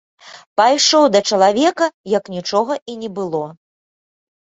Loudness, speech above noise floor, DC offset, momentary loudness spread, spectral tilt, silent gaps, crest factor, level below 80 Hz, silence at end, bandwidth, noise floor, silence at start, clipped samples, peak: -16 LUFS; over 74 dB; under 0.1%; 13 LU; -3 dB/octave; 0.46-0.56 s, 1.94-2.04 s, 2.82-2.86 s; 16 dB; -64 dBFS; 0.95 s; 8.2 kHz; under -90 dBFS; 0.25 s; under 0.1%; -2 dBFS